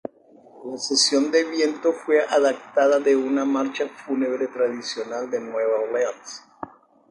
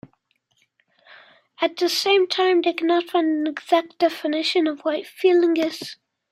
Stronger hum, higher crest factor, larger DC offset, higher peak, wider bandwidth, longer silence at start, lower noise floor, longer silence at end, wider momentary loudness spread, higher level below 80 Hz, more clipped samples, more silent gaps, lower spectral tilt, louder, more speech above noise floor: neither; about the same, 16 dB vs 18 dB; neither; about the same, -6 dBFS vs -4 dBFS; second, 11.5 kHz vs 15 kHz; second, 0.55 s vs 1.6 s; second, -51 dBFS vs -68 dBFS; about the same, 0.45 s vs 0.4 s; first, 19 LU vs 8 LU; about the same, -74 dBFS vs -74 dBFS; neither; neither; about the same, -2 dB/octave vs -2.5 dB/octave; about the same, -22 LUFS vs -21 LUFS; second, 29 dB vs 47 dB